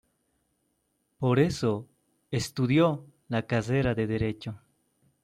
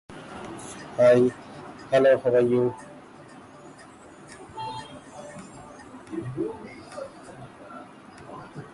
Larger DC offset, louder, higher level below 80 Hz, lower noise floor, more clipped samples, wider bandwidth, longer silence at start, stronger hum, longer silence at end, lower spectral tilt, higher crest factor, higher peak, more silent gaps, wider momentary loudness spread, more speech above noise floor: neither; second, -28 LUFS vs -23 LUFS; first, -54 dBFS vs -62 dBFS; first, -75 dBFS vs -48 dBFS; neither; first, 14 kHz vs 11.5 kHz; first, 1.2 s vs 0.1 s; neither; first, 0.65 s vs 0.05 s; about the same, -6.5 dB/octave vs -6.5 dB/octave; about the same, 18 dB vs 18 dB; about the same, -12 dBFS vs -10 dBFS; neither; second, 13 LU vs 27 LU; first, 49 dB vs 27 dB